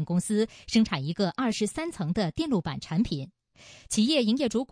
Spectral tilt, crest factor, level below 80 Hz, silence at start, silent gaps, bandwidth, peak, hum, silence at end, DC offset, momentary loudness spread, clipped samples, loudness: -5 dB/octave; 16 dB; -52 dBFS; 0 s; none; 10.5 kHz; -10 dBFS; none; 0.05 s; under 0.1%; 7 LU; under 0.1%; -27 LUFS